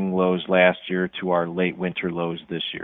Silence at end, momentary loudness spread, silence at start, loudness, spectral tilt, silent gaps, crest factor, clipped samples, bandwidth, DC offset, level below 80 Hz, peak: 0 s; 10 LU; 0 s; -23 LUFS; -9.5 dB/octave; none; 20 dB; under 0.1%; 4 kHz; under 0.1%; -60 dBFS; -2 dBFS